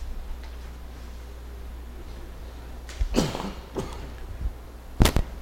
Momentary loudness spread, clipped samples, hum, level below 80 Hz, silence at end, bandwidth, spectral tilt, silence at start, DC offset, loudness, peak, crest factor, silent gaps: 18 LU; under 0.1%; none; -32 dBFS; 0 s; 16.5 kHz; -5 dB/octave; 0 s; under 0.1%; -32 LUFS; 0 dBFS; 30 dB; none